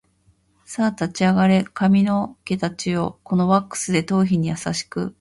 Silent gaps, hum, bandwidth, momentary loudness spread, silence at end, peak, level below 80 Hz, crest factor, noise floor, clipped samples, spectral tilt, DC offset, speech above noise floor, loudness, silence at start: none; none; 11.5 kHz; 8 LU; 0.1 s; -4 dBFS; -54 dBFS; 16 dB; -61 dBFS; under 0.1%; -6 dB/octave; under 0.1%; 41 dB; -21 LUFS; 0.7 s